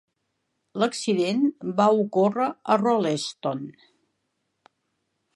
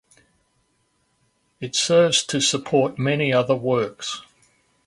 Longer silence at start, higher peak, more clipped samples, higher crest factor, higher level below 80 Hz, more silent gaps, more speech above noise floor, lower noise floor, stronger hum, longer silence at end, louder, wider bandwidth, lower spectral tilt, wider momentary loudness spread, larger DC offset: second, 0.75 s vs 1.6 s; about the same, -6 dBFS vs -6 dBFS; neither; about the same, 20 dB vs 18 dB; second, -78 dBFS vs -62 dBFS; neither; first, 54 dB vs 47 dB; first, -77 dBFS vs -68 dBFS; neither; first, 1.65 s vs 0.65 s; second, -24 LUFS vs -20 LUFS; about the same, 11.5 kHz vs 11.5 kHz; first, -5.5 dB/octave vs -3.5 dB/octave; second, 10 LU vs 14 LU; neither